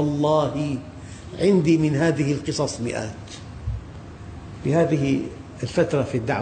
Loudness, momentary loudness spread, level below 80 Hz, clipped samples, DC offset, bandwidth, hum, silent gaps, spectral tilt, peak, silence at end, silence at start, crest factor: -23 LUFS; 19 LU; -44 dBFS; under 0.1%; under 0.1%; 9.4 kHz; none; none; -6.5 dB/octave; -8 dBFS; 0 s; 0 s; 16 dB